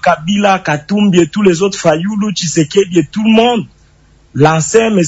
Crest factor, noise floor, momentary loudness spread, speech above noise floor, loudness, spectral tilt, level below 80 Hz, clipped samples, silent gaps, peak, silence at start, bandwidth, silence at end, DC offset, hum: 12 dB; -46 dBFS; 6 LU; 36 dB; -11 LUFS; -5 dB/octave; -46 dBFS; 0.4%; none; 0 dBFS; 0.05 s; 8 kHz; 0 s; under 0.1%; none